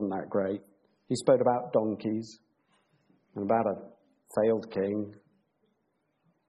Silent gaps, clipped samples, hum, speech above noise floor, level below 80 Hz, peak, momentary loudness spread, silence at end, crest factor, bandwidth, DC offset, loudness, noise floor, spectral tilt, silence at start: none; under 0.1%; none; 48 dB; -74 dBFS; -10 dBFS; 15 LU; 1.35 s; 20 dB; 9.4 kHz; under 0.1%; -30 LUFS; -76 dBFS; -6.5 dB/octave; 0 s